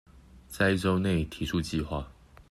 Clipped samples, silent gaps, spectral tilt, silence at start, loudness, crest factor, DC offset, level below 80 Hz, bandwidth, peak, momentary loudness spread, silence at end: under 0.1%; none; -6 dB/octave; 0.15 s; -29 LUFS; 18 dB; under 0.1%; -46 dBFS; 14 kHz; -12 dBFS; 13 LU; 0.4 s